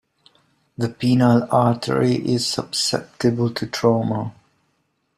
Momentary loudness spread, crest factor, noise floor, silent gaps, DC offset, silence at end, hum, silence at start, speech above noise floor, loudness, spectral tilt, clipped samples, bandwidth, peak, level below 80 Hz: 10 LU; 18 dB; -69 dBFS; none; under 0.1%; 0.85 s; none; 0.8 s; 50 dB; -20 LUFS; -5.5 dB/octave; under 0.1%; 14 kHz; -2 dBFS; -56 dBFS